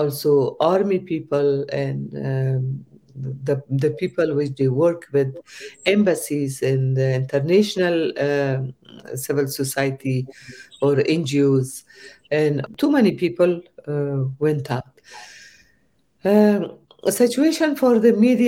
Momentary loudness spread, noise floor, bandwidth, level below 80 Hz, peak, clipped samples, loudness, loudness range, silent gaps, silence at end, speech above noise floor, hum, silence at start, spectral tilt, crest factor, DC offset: 13 LU; -64 dBFS; 16.5 kHz; -62 dBFS; -4 dBFS; under 0.1%; -20 LUFS; 3 LU; none; 0 s; 44 dB; none; 0 s; -6.5 dB/octave; 16 dB; under 0.1%